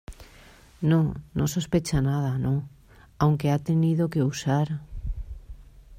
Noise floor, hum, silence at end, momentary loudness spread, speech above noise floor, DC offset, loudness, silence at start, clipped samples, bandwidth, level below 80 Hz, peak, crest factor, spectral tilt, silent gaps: -51 dBFS; none; 0 s; 15 LU; 27 dB; under 0.1%; -25 LUFS; 0.1 s; under 0.1%; 15.5 kHz; -42 dBFS; -10 dBFS; 16 dB; -7 dB/octave; none